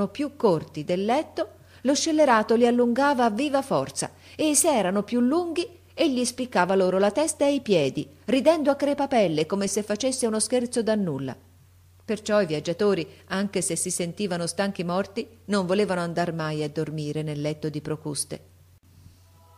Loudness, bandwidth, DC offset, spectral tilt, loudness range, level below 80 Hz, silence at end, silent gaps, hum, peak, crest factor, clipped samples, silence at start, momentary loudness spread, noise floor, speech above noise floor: -25 LUFS; 15.5 kHz; under 0.1%; -4.5 dB/octave; 5 LU; -64 dBFS; 1.2 s; none; none; -6 dBFS; 18 dB; under 0.1%; 0 s; 10 LU; -54 dBFS; 30 dB